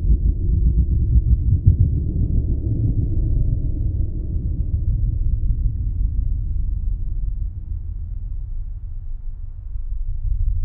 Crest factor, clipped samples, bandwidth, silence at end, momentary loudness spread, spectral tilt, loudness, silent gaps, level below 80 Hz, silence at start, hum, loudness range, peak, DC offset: 20 dB; under 0.1%; 0.8 kHz; 0 s; 15 LU; -16.5 dB/octave; -23 LUFS; none; -20 dBFS; 0 s; none; 11 LU; 0 dBFS; under 0.1%